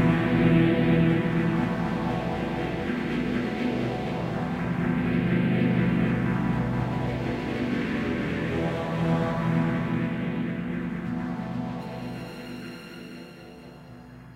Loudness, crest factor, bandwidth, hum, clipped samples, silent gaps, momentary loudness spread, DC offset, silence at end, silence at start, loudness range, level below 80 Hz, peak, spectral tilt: -26 LUFS; 16 dB; 9.8 kHz; none; under 0.1%; none; 17 LU; under 0.1%; 0 s; 0 s; 7 LU; -46 dBFS; -10 dBFS; -8 dB/octave